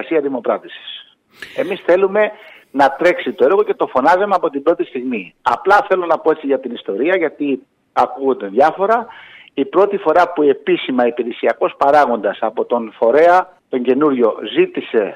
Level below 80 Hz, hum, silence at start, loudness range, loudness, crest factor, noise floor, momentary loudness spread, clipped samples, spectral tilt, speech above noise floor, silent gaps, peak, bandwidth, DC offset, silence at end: -60 dBFS; none; 0 s; 2 LU; -16 LUFS; 14 dB; -39 dBFS; 10 LU; under 0.1%; -6 dB/octave; 23 dB; none; -2 dBFS; 11 kHz; under 0.1%; 0 s